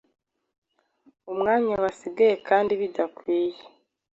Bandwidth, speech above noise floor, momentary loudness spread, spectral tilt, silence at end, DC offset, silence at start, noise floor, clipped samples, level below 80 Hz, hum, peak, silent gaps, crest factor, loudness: 8 kHz; 39 dB; 7 LU; -6 dB/octave; 0.5 s; under 0.1%; 1.25 s; -63 dBFS; under 0.1%; -64 dBFS; none; -6 dBFS; none; 20 dB; -24 LUFS